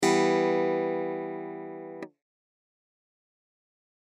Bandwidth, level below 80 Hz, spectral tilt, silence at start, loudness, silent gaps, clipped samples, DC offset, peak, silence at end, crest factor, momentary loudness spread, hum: 13 kHz; -84 dBFS; -4.5 dB/octave; 0 s; -28 LUFS; none; under 0.1%; under 0.1%; -12 dBFS; 2 s; 18 dB; 18 LU; none